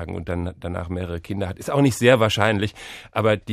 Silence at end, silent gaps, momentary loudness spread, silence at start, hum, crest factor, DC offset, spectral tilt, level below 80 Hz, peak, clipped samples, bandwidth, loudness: 0 s; none; 13 LU; 0 s; none; 20 dB; under 0.1%; -5.5 dB/octave; -44 dBFS; -2 dBFS; under 0.1%; 15 kHz; -22 LUFS